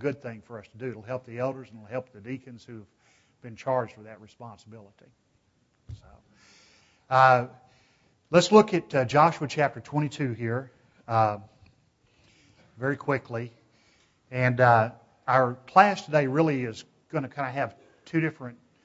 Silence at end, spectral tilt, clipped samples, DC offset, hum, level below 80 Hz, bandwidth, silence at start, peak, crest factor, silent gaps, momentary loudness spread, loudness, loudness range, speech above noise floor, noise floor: 0.3 s; -6 dB/octave; under 0.1%; under 0.1%; none; -66 dBFS; 8 kHz; 0 s; -4 dBFS; 24 dB; none; 25 LU; -25 LUFS; 14 LU; 43 dB; -69 dBFS